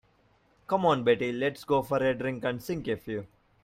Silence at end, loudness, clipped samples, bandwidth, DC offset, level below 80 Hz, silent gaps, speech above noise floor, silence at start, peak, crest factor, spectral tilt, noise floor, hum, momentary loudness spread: 0.35 s; -29 LUFS; under 0.1%; 16 kHz; under 0.1%; -60 dBFS; none; 38 dB; 0.7 s; -10 dBFS; 18 dB; -6.5 dB/octave; -66 dBFS; none; 9 LU